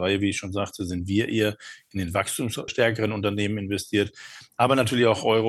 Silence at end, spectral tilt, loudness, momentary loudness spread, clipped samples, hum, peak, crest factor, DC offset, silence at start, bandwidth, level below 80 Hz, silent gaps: 0 s; -5 dB/octave; -25 LUFS; 10 LU; under 0.1%; none; -6 dBFS; 18 dB; under 0.1%; 0 s; 12.5 kHz; -56 dBFS; none